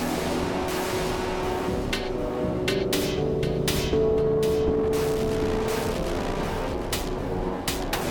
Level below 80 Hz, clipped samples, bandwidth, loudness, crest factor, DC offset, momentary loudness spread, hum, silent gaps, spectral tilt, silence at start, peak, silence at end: -36 dBFS; under 0.1%; 18 kHz; -26 LUFS; 12 dB; under 0.1%; 5 LU; none; none; -5 dB/octave; 0 s; -12 dBFS; 0 s